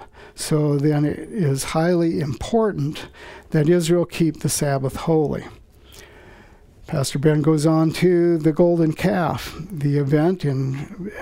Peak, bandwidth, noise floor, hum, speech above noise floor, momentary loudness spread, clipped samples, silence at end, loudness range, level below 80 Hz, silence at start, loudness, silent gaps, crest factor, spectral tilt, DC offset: -4 dBFS; 16 kHz; -47 dBFS; none; 27 dB; 11 LU; under 0.1%; 0 s; 4 LU; -46 dBFS; 0 s; -20 LUFS; none; 16 dB; -6.5 dB/octave; under 0.1%